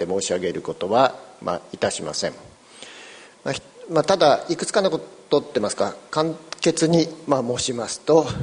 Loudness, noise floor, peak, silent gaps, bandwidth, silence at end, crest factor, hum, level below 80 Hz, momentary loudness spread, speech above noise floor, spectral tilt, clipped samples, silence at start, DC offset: -22 LUFS; -44 dBFS; -2 dBFS; none; 10.5 kHz; 0 s; 20 dB; none; -56 dBFS; 13 LU; 22 dB; -4.5 dB/octave; under 0.1%; 0 s; under 0.1%